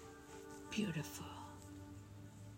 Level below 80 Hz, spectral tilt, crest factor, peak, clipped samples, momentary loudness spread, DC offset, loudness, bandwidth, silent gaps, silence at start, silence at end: -70 dBFS; -5 dB/octave; 20 dB; -28 dBFS; under 0.1%; 14 LU; under 0.1%; -48 LUFS; 16 kHz; none; 0 s; 0 s